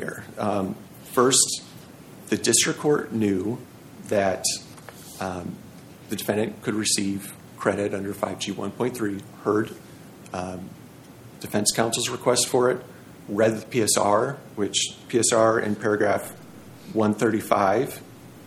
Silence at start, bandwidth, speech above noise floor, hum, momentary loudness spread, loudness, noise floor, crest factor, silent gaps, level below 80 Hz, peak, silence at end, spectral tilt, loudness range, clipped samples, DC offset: 0 s; 19 kHz; 22 dB; none; 20 LU; -24 LUFS; -45 dBFS; 20 dB; none; -64 dBFS; -4 dBFS; 0 s; -3.5 dB/octave; 6 LU; under 0.1%; under 0.1%